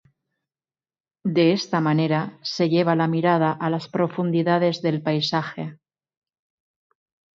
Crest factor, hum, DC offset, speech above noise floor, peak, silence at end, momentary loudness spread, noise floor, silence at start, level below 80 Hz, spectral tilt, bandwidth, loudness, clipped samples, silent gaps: 16 dB; none; under 0.1%; over 69 dB; -6 dBFS; 1.65 s; 8 LU; under -90 dBFS; 1.25 s; -70 dBFS; -6.5 dB/octave; 7.4 kHz; -22 LUFS; under 0.1%; none